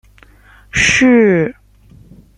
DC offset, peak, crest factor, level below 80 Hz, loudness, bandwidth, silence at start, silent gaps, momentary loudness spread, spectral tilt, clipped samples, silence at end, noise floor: under 0.1%; 0 dBFS; 14 dB; -40 dBFS; -12 LUFS; 10.5 kHz; 0.75 s; none; 12 LU; -4 dB/octave; under 0.1%; 0.85 s; -45 dBFS